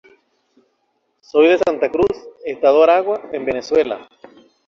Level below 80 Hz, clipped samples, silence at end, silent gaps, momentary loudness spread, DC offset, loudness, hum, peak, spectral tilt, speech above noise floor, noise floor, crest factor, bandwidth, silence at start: -54 dBFS; under 0.1%; 0.65 s; none; 11 LU; under 0.1%; -16 LUFS; none; -2 dBFS; -5.5 dB/octave; 52 dB; -67 dBFS; 16 dB; 7.2 kHz; 1.35 s